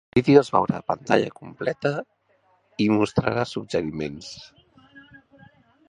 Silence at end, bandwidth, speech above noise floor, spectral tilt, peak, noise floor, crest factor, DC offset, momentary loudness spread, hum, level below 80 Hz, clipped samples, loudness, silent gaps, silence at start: 0.9 s; 10.5 kHz; 42 dB; -6.5 dB/octave; -2 dBFS; -64 dBFS; 22 dB; under 0.1%; 16 LU; none; -54 dBFS; under 0.1%; -23 LUFS; none; 0.15 s